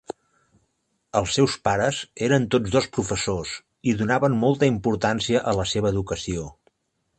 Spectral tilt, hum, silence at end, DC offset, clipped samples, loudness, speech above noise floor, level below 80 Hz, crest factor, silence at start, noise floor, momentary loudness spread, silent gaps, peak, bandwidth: -5 dB/octave; none; 0.65 s; under 0.1%; under 0.1%; -23 LUFS; 51 dB; -46 dBFS; 18 dB; 1.15 s; -73 dBFS; 9 LU; none; -4 dBFS; 9.2 kHz